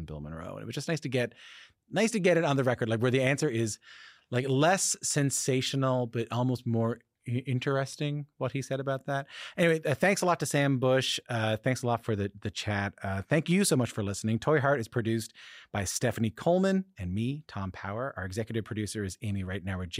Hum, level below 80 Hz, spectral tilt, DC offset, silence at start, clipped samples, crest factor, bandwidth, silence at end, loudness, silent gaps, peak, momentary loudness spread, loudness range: none; -62 dBFS; -5 dB/octave; under 0.1%; 0 s; under 0.1%; 18 dB; 15.5 kHz; 0 s; -29 LUFS; none; -12 dBFS; 10 LU; 4 LU